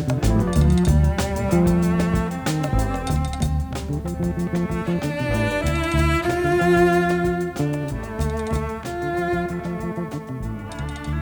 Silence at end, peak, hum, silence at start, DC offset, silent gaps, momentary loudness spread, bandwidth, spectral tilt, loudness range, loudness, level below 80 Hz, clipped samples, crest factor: 0 s; -6 dBFS; none; 0 s; under 0.1%; none; 10 LU; over 20 kHz; -6.5 dB/octave; 5 LU; -22 LUFS; -28 dBFS; under 0.1%; 16 dB